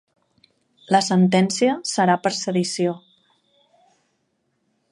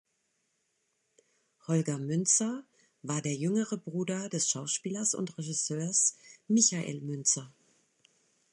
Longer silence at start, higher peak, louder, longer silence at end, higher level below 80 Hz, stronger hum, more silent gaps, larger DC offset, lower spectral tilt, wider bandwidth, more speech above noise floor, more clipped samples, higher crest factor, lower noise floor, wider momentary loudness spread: second, 0.9 s vs 1.7 s; first, -2 dBFS vs -10 dBFS; first, -20 LUFS vs -30 LUFS; first, 1.95 s vs 1.05 s; first, -70 dBFS vs -78 dBFS; neither; neither; neither; first, -5 dB/octave vs -3.5 dB/octave; about the same, 11.5 kHz vs 11.5 kHz; first, 52 dB vs 47 dB; neither; about the same, 20 dB vs 22 dB; second, -71 dBFS vs -78 dBFS; second, 7 LU vs 10 LU